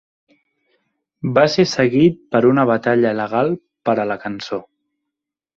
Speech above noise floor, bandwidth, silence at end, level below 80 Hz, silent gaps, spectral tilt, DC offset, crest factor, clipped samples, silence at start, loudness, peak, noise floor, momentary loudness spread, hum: 67 dB; 7.6 kHz; 0.95 s; -58 dBFS; none; -6.5 dB/octave; under 0.1%; 16 dB; under 0.1%; 1.25 s; -17 LUFS; -2 dBFS; -83 dBFS; 12 LU; none